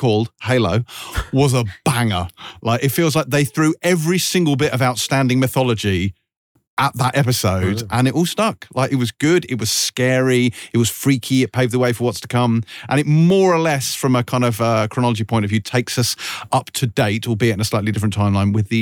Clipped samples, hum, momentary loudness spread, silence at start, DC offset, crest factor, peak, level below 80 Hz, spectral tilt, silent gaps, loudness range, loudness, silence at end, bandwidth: under 0.1%; none; 4 LU; 0 s; under 0.1%; 14 dB; -4 dBFS; -44 dBFS; -5 dB/octave; 6.37-6.55 s, 6.67-6.77 s; 2 LU; -18 LUFS; 0 s; 19 kHz